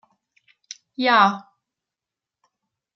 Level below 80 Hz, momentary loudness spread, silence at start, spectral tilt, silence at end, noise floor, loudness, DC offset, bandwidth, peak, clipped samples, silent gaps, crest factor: -82 dBFS; 25 LU; 1 s; -4 dB/octave; 1.55 s; -88 dBFS; -18 LUFS; under 0.1%; 7.6 kHz; -2 dBFS; under 0.1%; none; 22 dB